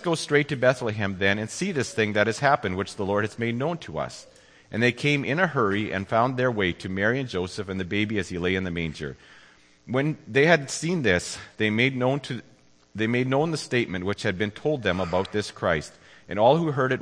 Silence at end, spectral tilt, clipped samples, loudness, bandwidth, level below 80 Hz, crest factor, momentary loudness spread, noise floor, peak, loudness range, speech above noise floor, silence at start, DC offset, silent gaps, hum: 0 s; -5.5 dB/octave; under 0.1%; -25 LUFS; 10.5 kHz; -56 dBFS; 20 dB; 10 LU; -54 dBFS; -4 dBFS; 3 LU; 29 dB; 0 s; under 0.1%; none; none